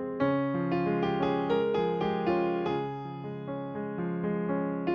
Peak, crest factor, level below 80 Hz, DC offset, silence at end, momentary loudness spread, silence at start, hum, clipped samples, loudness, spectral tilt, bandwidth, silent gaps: -14 dBFS; 16 dB; -62 dBFS; under 0.1%; 0 s; 9 LU; 0 s; none; under 0.1%; -30 LUFS; -9 dB/octave; 6.6 kHz; none